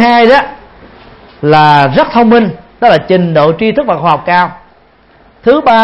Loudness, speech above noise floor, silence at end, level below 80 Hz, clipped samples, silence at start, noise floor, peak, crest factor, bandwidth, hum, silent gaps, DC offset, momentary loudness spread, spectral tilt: -8 LUFS; 37 dB; 0 s; -42 dBFS; 0.7%; 0 s; -44 dBFS; 0 dBFS; 8 dB; 8.6 kHz; none; none; under 0.1%; 9 LU; -7.5 dB/octave